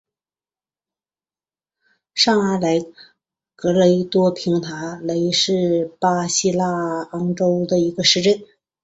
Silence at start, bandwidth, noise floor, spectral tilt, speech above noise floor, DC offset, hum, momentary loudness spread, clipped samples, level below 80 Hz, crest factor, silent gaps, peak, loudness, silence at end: 2.15 s; 8.2 kHz; under -90 dBFS; -4.5 dB/octave; over 72 dB; under 0.1%; none; 9 LU; under 0.1%; -62 dBFS; 18 dB; none; -2 dBFS; -19 LUFS; 0.4 s